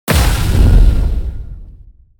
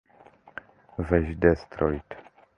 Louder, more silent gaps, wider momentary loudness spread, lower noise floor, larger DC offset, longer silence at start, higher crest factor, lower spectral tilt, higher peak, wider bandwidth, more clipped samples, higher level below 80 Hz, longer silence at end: first, -14 LUFS vs -26 LUFS; neither; second, 18 LU vs 21 LU; second, -39 dBFS vs -55 dBFS; neither; second, 0.05 s vs 1 s; second, 12 dB vs 24 dB; second, -5.5 dB/octave vs -9.5 dB/octave; first, 0 dBFS vs -4 dBFS; first, 19.5 kHz vs 6.6 kHz; neither; first, -12 dBFS vs -40 dBFS; first, 0.5 s vs 0.35 s